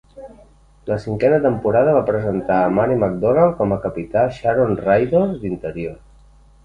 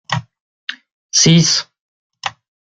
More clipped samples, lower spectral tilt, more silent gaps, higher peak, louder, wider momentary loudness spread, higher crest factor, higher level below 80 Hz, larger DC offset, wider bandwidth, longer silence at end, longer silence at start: neither; first, -9.5 dB/octave vs -3.5 dB/octave; second, none vs 0.41-0.67 s, 0.92-1.09 s, 1.80-2.10 s; about the same, 0 dBFS vs 0 dBFS; second, -18 LUFS vs -13 LUFS; second, 10 LU vs 20 LU; about the same, 18 dB vs 18 dB; first, -44 dBFS vs -52 dBFS; neither; about the same, 9.4 kHz vs 9.2 kHz; first, 0.7 s vs 0.35 s; about the same, 0.15 s vs 0.1 s